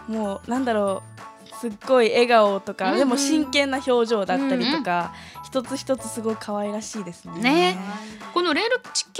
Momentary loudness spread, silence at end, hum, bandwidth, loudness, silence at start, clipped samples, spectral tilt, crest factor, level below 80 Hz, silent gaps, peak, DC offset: 15 LU; 0 s; none; 15.5 kHz; -22 LUFS; 0 s; under 0.1%; -3.5 dB/octave; 20 dB; -60 dBFS; none; -4 dBFS; under 0.1%